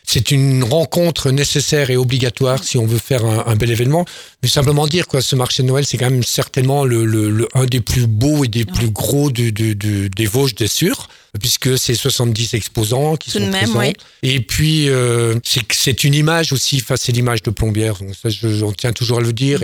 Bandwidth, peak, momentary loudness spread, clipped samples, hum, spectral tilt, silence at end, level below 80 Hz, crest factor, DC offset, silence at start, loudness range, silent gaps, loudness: 19 kHz; 0 dBFS; 5 LU; under 0.1%; none; -4.5 dB/octave; 0 s; -38 dBFS; 16 dB; under 0.1%; 0.05 s; 2 LU; none; -15 LUFS